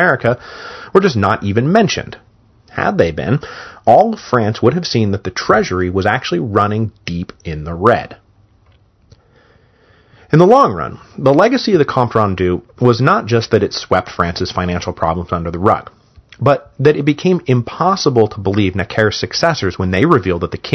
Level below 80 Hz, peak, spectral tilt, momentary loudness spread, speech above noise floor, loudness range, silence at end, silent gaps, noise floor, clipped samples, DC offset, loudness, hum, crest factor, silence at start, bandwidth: -42 dBFS; 0 dBFS; -6.5 dB/octave; 9 LU; 37 dB; 4 LU; 0 s; none; -51 dBFS; 0.3%; under 0.1%; -14 LUFS; none; 14 dB; 0 s; 8.2 kHz